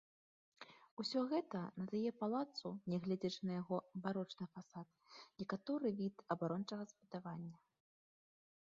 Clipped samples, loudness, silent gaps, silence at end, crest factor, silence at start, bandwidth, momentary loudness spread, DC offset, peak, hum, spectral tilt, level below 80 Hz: under 0.1%; -44 LUFS; 0.91-0.97 s; 1.1 s; 20 dB; 0.6 s; 7.4 kHz; 15 LU; under 0.1%; -24 dBFS; none; -6 dB/octave; -84 dBFS